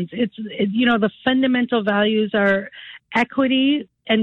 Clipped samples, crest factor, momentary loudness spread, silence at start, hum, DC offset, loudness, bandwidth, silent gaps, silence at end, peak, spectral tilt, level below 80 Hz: under 0.1%; 16 dB; 7 LU; 0 s; none; under 0.1%; -19 LUFS; 6.6 kHz; none; 0 s; -4 dBFS; -7 dB/octave; -58 dBFS